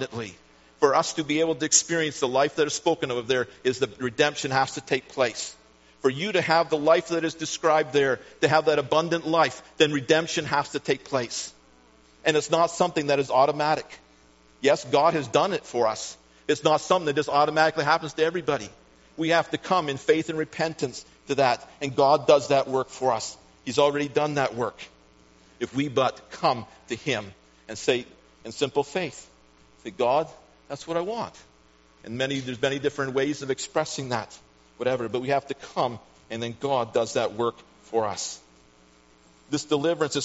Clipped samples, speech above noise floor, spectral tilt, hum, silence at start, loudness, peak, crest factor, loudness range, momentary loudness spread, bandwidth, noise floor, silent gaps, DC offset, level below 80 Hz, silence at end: under 0.1%; 33 dB; -3 dB/octave; none; 0 s; -25 LUFS; -4 dBFS; 22 dB; 6 LU; 12 LU; 8 kHz; -58 dBFS; none; under 0.1%; -64 dBFS; 0 s